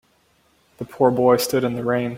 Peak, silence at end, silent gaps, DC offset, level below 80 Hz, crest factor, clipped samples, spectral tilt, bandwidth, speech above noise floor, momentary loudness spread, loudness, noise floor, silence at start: -2 dBFS; 0 s; none; under 0.1%; -58 dBFS; 18 dB; under 0.1%; -5.5 dB/octave; 16.5 kHz; 42 dB; 17 LU; -19 LUFS; -61 dBFS; 0.8 s